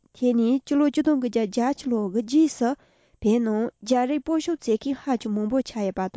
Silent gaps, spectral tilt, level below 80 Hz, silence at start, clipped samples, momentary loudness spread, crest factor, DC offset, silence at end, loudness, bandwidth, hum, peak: none; -6 dB/octave; -56 dBFS; 0.2 s; under 0.1%; 6 LU; 14 dB; under 0.1%; 0.1 s; -24 LUFS; 8 kHz; none; -10 dBFS